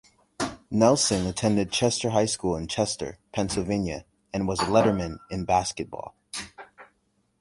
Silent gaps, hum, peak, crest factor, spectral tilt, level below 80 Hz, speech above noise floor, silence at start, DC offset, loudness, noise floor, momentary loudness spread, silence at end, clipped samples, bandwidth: none; none; -6 dBFS; 22 dB; -4.5 dB/octave; -48 dBFS; 45 dB; 0.4 s; under 0.1%; -26 LUFS; -70 dBFS; 15 LU; 0.55 s; under 0.1%; 11.5 kHz